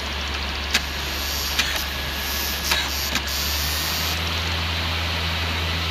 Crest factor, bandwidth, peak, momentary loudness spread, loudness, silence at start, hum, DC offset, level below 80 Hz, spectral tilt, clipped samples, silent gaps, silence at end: 20 dB; 15.5 kHz; -4 dBFS; 4 LU; -23 LUFS; 0 s; none; under 0.1%; -32 dBFS; -2.5 dB/octave; under 0.1%; none; 0 s